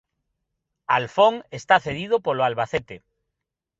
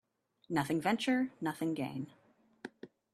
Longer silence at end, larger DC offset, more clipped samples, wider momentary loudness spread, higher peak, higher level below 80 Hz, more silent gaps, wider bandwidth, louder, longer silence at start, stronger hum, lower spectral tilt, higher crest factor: first, 0.85 s vs 0.3 s; neither; neither; second, 10 LU vs 19 LU; first, -2 dBFS vs -18 dBFS; first, -58 dBFS vs -76 dBFS; neither; second, 8 kHz vs 13.5 kHz; first, -22 LUFS vs -35 LUFS; first, 0.9 s vs 0.5 s; neither; about the same, -5 dB/octave vs -5.5 dB/octave; about the same, 22 dB vs 20 dB